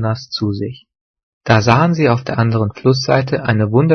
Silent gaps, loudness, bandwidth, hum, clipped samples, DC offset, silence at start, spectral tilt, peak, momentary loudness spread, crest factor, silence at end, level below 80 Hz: 1.01-1.14 s, 1.23-1.41 s; -15 LUFS; 6.4 kHz; none; under 0.1%; under 0.1%; 0 s; -6.5 dB/octave; 0 dBFS; 9 LU; 14 dB; 0 s; -48 dBFS